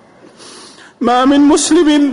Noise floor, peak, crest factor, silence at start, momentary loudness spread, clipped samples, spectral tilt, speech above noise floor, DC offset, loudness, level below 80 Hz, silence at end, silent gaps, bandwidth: -39 dBFS; -4 dBFS; 8 dB; 0.45 s; 5 LU; under 0.1%; -2.5 dB/octave; 30 dB; under 0.1%; -10 LUFS; -46 dBFS; 0 s; none; 11 kHz